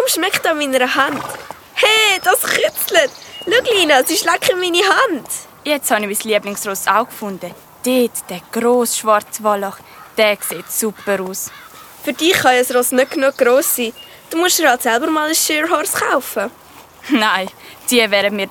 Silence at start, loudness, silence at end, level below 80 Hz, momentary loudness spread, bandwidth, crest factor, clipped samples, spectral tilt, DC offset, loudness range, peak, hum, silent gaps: 0 s; -15 LUFS; 0 s; -60 dBFS; 13 LU; 20 kHz; 16 dB; under 0.1%; -1.5 dB/octave; under 0.1%; 4 LU; 0 dBFS; none; none